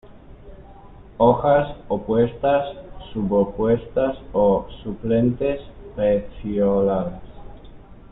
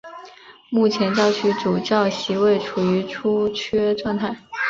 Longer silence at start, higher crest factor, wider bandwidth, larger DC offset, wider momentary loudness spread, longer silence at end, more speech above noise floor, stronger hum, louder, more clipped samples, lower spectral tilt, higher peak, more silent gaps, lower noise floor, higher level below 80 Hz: about the same, 0.1 s vs 0.05 s; about the same, 18 dB vs 16 dB; second, 4 kHz vs 7.6 kHz; neither; first, 13 LU vs 6 LU; about the same, 0.05 s vs 0 s; about the same, 23 dB vs 24 dB; neither; about the same, -21 LUFS vs -20 LUFS; neither; first, -12 dB/octave vs -5.5 dB/octave; about the same, -2 dBFS vs -4 dBFS; neither; about the same, -43 dBFS vs -44 dBFS; first, -42 dBFS vs -56 dBFS